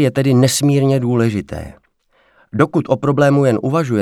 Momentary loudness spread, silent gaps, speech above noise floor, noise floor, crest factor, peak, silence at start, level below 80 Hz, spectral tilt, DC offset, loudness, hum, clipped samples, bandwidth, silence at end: 14 LU; none; 44 dB; -58 dBFS; 14 dB; 0 dBFS; 0 s; -46 dBFS; -6 dB/octave; under 0.1%; -15 LUFS; none; under 0.1%; 15 kHz; 0 s